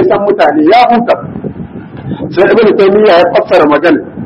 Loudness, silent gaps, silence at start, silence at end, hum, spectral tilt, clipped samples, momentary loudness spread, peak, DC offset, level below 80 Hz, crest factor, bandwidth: -7 LUFS; none; 0 s; 0 s; none; -7.5 dB/octave; 1%; 16 LU; 0 dBFS; under 0.1%; -42 dBFS; 8 dB; 7.8 kHz